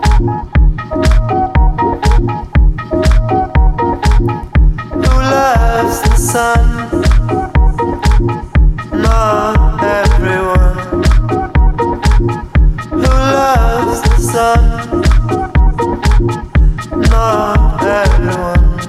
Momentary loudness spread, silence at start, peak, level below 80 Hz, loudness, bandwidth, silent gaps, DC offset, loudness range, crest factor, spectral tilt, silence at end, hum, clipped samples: 4 LU; 0 s; 0 dBFS; -12 dBFS; -12 LUFS; 13.5 kHz; none; under 0.1%; 1 LU; 10 dB; -6 dB/octave; 0 s; none; under 0.1%